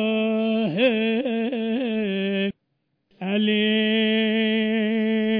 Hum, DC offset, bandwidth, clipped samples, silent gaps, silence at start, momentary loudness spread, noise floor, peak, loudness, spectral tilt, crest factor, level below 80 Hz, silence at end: none; under 0.1%; 4.5 kHz; under 0.1%; none; 0 s; 5 LU; -74 dBFS; -10 dBFS; -22 LUFS; -9 dB/octave; 12 dB; -74 dBFS; 0 s